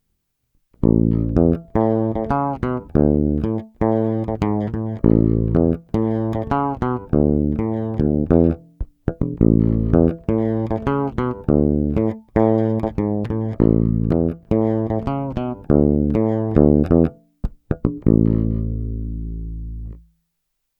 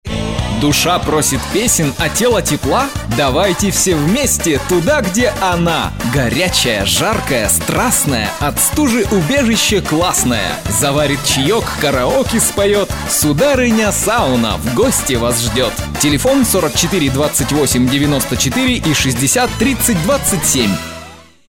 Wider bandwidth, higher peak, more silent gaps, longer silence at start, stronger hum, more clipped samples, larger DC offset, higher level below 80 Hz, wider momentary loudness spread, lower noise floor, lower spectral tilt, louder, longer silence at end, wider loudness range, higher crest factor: second, 5 kHz vs 17.5 kHz; about the same, 0 dBFS vs -2 dBFS; neither; first, 0.8 s vs 0.05 s; neither; neither; neither; about the same, -30 dBFS vs -30 dBFS; first, 11 LU vs 4 LU; first, -75 dBFS vs -36 dBFS; first, -11.5 dB/octave vs -3.5 dB/octave; second, -19 LUFS vs -13 LUFS; first, 0.8 s vs 0.25 s; about the same, 2 LU vs 1 LU; first, 18 dB vs 12 dB